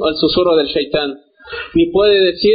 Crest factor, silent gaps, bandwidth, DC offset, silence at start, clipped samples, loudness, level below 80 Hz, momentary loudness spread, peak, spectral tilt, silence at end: 12 dB; none; 5 kHz; under 0.1%; 0 s; under 0.1%; -14 LUFS; -42 dBFS; 16 LU; -2 dBFS; -3 dB/octave; 0 s